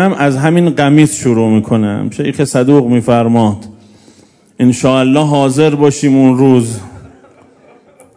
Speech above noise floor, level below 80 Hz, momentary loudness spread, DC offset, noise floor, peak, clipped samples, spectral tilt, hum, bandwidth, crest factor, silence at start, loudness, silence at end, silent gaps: 36 dB; -48 dBFS; 7 LU; under 0.1%; -45 dBFS; 0 dBFS; 1%; -6.5 dB/octave; none; 11 kHz; 10 dB; 0 s; -10 LUFS; 1.15 s; none